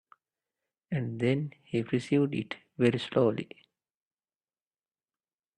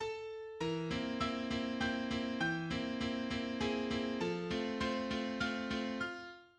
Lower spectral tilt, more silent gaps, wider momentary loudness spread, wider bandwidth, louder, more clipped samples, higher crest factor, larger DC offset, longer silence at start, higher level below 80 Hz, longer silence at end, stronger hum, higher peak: first, -7.5 dB/octave vs -5 dB/octave; neither; first, 10 LU vs 5 LU; about the same, 10.5 kHz vs 9.8 kHz; first, -30 LUFS vs -38 LUFS; neither; about the same, 20 dB vs 16 dB; neither; first, 0.9 s vs 0 s; second, -70 dBFS vs -58 dBFS; first, 2.1 s vs 0.15 s; neither; first, -12 dBFS vs -22 dBFS